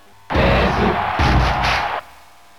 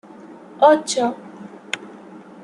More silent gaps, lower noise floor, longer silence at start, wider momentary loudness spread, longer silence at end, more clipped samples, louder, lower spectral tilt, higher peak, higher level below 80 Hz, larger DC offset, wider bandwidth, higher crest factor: neither; first, -46 dBFS vs -41 dBFS; about the same, 0.3 s vs 0.25 s; second, 8 LU vs 25 LU; first, 0.55 s vs 0.25 s; neither; about the same, -17 LUFS vs -19 LUFS; first, -6 dB/octave vs -3 dB/octave; about the same, -4 dBFS vs -2 dBFS; first, -26 dBFS vs -72 dBFS; first, 0.6% vs under 0.1%; first, 13.5 kHz vs 11.5 kHz; second, 14 dB vs 20 dB